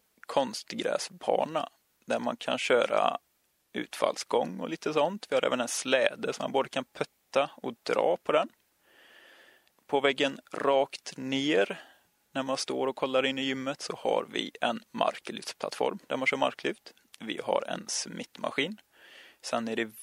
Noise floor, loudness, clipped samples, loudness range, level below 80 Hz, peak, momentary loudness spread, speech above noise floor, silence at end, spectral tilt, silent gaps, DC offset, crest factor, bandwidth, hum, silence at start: -62 dBFS; -30 LUFS; under 0.1%; 3 LU; -78 dBFS; -6 dBFS; 11 LU; 32 dB; 0 s; -3 dB/octave; none; under 0.1%; 24 dB; 15.5 kHz; none; 0.3 s